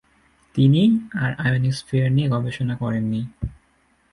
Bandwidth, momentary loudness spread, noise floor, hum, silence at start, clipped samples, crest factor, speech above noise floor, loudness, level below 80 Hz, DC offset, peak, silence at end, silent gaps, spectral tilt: 11.5 kHz; 12 LU; -62 dBFS; none; 0.55 s; under 0.1%; 16 dB; 42 dB; -21 LUFS; -46 dBFS; under 0.1%; -6 dBFS; 0.6 s; none; -7.5 dB/octave